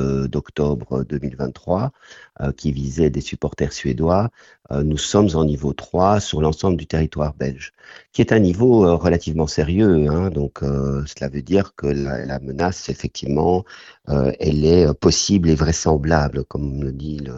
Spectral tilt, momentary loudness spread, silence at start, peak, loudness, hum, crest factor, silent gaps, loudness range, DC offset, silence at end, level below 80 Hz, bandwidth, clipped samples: -6 dB/octave; 11 LU; 0 s; 0 dBFS; -20 LUFS; none; 18 dB; none; 5 LU; under 0.1%; 0 s; -32 dBFS; 8 kHz; under 0.1%